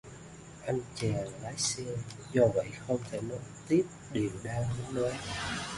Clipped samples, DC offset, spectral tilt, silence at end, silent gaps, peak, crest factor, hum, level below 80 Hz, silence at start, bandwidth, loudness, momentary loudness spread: under 0.1%; under 0.1%; -5 dB/octave; 0 s; none; -14 dBFS; 20 dB; none; -56 dBFS; 0.05 s; 11.5 kHz; -33 LUFS; 12 LU